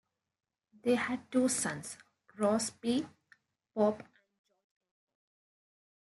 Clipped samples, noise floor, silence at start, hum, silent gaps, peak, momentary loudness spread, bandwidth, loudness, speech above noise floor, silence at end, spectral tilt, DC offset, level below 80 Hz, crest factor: under 0.1%; -68 dBFS; 0.85 s; none; none; -18 dBFS; 15 LU; 12 kHz; -33 LUFS; 37 dB; 2.05 s; -4 dB/octave; under 0.1%; -80 dBFS; 18 dB